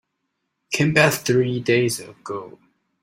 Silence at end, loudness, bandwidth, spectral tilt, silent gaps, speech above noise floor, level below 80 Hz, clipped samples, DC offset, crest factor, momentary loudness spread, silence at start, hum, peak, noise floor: 0.55 s; -19 LUFS; 16.5 kHz; -5 dB/octave; none; 56 dB; -58 dBFS; under 0.1%; under 0.1%; 20 dB; 16 LU; 0.7 s; none; -2 dBFS; -76 dBFS